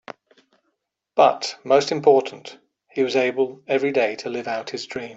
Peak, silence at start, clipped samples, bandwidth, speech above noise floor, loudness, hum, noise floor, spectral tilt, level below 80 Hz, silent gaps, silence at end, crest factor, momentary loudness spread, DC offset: -4 dBFS; 1.15 s; under 0.1%; 8 kHz; 55 dB; -21 LUFS; none; -75 dBFS; -4 dB/octave; -70 dBFS; none; 0 s; 20 dB; 16 LU; under 0.1%